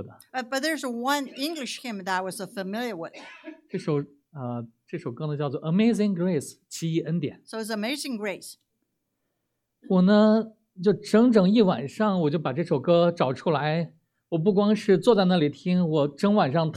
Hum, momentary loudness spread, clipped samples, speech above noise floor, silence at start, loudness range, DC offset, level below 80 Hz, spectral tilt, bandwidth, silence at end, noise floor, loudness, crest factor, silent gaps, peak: none; 16 LU; under 0.1%; 55 dB; 0 s; 10 LU; under 0.1%; -72 dBFS; -6.5 dB/octave; 14.5 kHz; 0 s; -79 dBFS; -25 LUFS; 18 dB; none; -6 dBFS